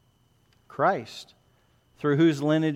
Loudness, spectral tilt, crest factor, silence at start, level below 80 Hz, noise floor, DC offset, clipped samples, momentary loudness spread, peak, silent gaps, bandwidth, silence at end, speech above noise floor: -25 LUFS; -7 dB/octave; 18 dB; 0.75 s; -70 dBFS; -64 dBFS; under 0.1%; under 0.1%; 20 LU; -10 dBFS; none; 10.5 kHz; 0 s; 41 dB